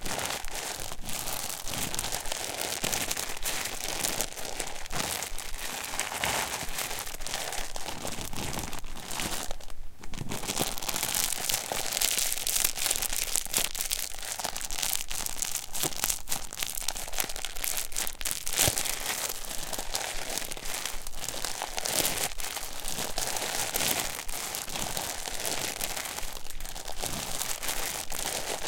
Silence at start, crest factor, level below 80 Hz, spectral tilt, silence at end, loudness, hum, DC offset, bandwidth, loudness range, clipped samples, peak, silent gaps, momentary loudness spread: 0 s; 28 dB; -42 dBFS; -1 dB/octave; 0 s; -31 LUFS; none; under 0.1%; 17 kHz; 5 LU; under 0.1%; -4 dBFS; none; 9 LU